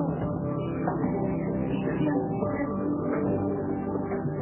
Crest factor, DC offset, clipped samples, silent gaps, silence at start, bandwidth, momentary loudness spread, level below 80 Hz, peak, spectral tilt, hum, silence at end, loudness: 14 dB; under 0.1%; under 0.1%; none; 0 s; 3.2 kHz; 3 LU; -48 dBFS; -14 dBFS; -9 dB/octave; none; 0 s; -29 LUFS